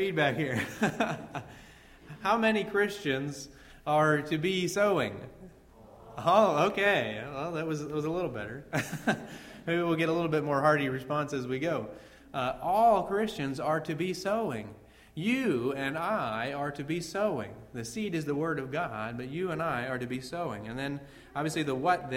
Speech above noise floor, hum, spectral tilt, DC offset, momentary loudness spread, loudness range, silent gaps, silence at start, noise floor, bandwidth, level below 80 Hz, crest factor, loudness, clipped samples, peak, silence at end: 24 dB; none; -5.5 dB/octave; under 0.1%; 14 LU; 5 LU; none; 0 s; -54 dBFS; 16 kHz; -60 dBFS; 22 dB; -30 LUFS; under 0.1%; -10 dBFS; 0 s